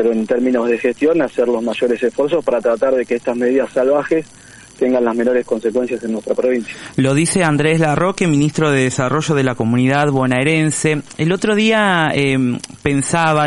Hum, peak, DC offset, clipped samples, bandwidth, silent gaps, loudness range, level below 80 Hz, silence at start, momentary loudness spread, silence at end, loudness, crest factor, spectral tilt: none; -2 dBFS; under 0.1%; under 0.1%; 11.5 kHz; none; 3 LU; -48 dBFS; 0 s; 5 LU; 0 s; -16 LUFS; 14 dB; -5.5 dB/octave